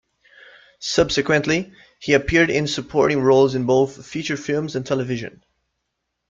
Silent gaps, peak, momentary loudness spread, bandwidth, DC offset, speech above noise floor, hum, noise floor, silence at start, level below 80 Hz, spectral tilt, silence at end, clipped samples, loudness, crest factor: none; -2 dBFS; 13 LU; 7.6 kHz; under 0.1%; 58 dB; none; -77 dBFS; 0.8 s; -46 dBFS; -5 dB/octave; 1 s; under 0.1%; -20 LUFS; 18 dB